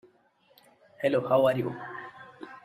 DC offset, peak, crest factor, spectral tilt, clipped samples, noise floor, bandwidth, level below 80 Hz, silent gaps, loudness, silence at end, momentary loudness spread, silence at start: under 0.1%; -10 dBFS; 20 dB; -7.5 dB/octave; under 0.1%; -65 dBFS; 14 kHz; -72 dBFS; none; -27 LUFS; 0.05 s; 22 LU; 1 s